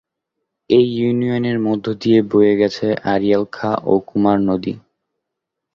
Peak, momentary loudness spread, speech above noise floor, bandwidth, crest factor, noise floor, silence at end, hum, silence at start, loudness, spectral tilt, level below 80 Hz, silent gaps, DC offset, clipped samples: -2 dBFS; 6 LU; 64 dB; 7.2 kHz; 16 dB; -80 dBFS; 0.95 s; none; 0.7 s; -17 LUFS; -8 dB/octave; -54 dBFS; none; under 0.1%; under 0.1%